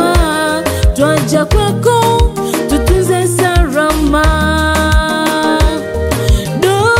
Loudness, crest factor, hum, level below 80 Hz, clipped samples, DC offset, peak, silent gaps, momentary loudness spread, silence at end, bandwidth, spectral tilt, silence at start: -12 LUFS; 10 dB; none; -16 dBFS; under 0.1%; 0.2%; 0 dBFS; none; 3 LU; 0 s; 16.5 kHz; -5 dB/octave; 0 s